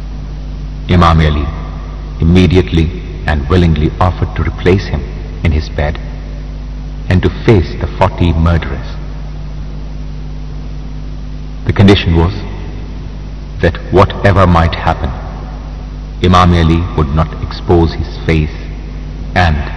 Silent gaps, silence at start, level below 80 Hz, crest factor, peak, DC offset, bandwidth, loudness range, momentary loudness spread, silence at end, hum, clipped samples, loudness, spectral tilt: none; 0 s; -20 dBFS; 12 dB; 0 dBFS; 1%; 7.8 kHz; 5 LU; 17 LU; 0 s; none; 1%; -12 LUFS; -7.5 dB/octave